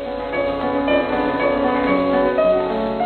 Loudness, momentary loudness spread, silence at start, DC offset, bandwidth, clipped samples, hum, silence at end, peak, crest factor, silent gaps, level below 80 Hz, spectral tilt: -19 LUFS; 5 LU; 0 s; under 0.1%; 4.6 kHz; under 0.1%; none; 0 s; -6 dBFS; 12 dB; none; -42 dBFS; -8 dB/octave